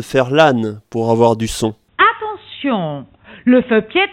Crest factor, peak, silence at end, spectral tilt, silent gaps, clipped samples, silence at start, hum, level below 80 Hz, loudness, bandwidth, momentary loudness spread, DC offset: 16 dB; 0 dBFS; 0 s; -5.5 dB/octave; none; under 0.1%; 0 s; none; -44 dBFS; -15 LUFS; 15.5 kHz; 12 LU; under 0.1%